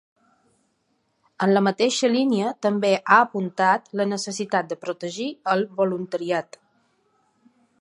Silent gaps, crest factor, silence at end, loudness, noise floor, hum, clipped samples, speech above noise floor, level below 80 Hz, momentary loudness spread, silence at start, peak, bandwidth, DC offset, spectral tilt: none; 22 dB; 1.4 s; -22 LUFS; -70 dBFS; none; under 0.1%; 48 dB; -74 dBFS; 11 LU; 1.4 s; -2 dBFS; 11 kHz; under 0.1%; -4.5 dB/octave